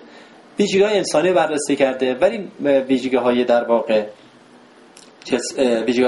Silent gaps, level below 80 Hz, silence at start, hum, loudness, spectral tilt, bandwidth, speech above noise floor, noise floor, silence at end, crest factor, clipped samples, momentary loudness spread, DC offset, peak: none; -60 dBFS; 0.15 s; none; -18 LUFS; -4.5 dB/octave; 11.5 kHz; 30 dB; -47 dBFS; 0 s; 16 dB; under 0.1%; 7 LU; under 0.1%; -4 dBFS